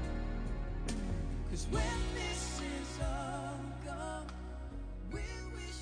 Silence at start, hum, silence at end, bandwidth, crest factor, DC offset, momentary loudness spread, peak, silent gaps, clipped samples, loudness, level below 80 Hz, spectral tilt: 0 s; none; 0 s; 10.5 kHz; 14 dB; under 0.1%; 9 LU; -24 dBFS; none; under 0.1%; -40 LUFS; -40 dBFS; -5 dB/octave